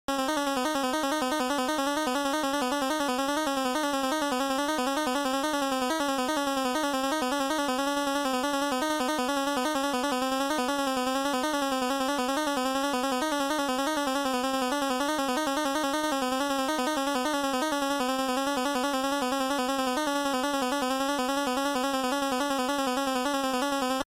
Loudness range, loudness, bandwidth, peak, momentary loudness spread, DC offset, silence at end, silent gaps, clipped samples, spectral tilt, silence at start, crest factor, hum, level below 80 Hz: 0 LU; -28 LUFS; 16 kHz; -16 dBFS; 0 LU; under 0.1%; 0.05 s; none; under 0.1%; -2 dB/octave; 0.1 s; 12 dB; none; -60 dBFS